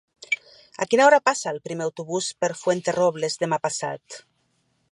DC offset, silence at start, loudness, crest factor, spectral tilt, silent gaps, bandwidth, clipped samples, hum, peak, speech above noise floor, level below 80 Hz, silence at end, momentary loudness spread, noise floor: under 0.1%; 0.3 s; -23 LUFS; 22 dB; -3.5 dB/octave; none; 11.5 kHz; under 0.1%; none; -2 dBFS; 46 dB; -74 dBFS; 0.7 s; 15 LU; -69 dBFS